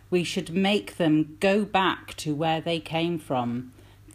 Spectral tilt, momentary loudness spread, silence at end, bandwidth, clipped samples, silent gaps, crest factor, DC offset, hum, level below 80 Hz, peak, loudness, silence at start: -5.5 dB/octave; 8 LU; 0 s; 15.5 kHz; under 0.1%; none; 16 dB; under 0.1%; none; -58 dBFS; -10 dBFS; -26 LUFS; 0.1 s